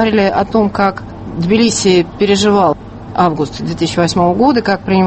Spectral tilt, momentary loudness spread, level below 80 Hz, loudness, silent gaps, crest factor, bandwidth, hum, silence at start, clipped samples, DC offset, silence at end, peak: -5 dB/octave; 9 LU; -38 dBFS; -13 LUFS; none; 12 dB; 8.8 kHz; none; 0 s; under 0.1%; under 0.1%; 0 s; 0 dBFS